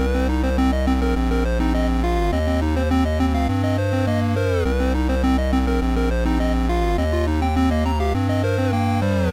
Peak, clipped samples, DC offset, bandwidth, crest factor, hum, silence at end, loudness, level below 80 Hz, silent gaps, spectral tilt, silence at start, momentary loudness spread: -12 dBFS; under 0.1%; under 0.1%; 15 kHz; 8 dB; none; 0 s; -20 LUFS; -24 dBFS; none; -7 dB/octave; 0 s; 1 LU